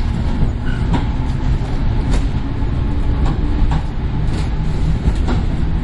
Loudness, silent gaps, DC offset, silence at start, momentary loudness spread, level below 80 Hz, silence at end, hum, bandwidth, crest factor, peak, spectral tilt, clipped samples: -20 LUFS; none; under 0.1%; 0 s; 2 LU; -18 dBFS; 0 s; none; 10.5 kHz; 14 dB; -2 dBFS; -7.5 dB/octave; under 0.1%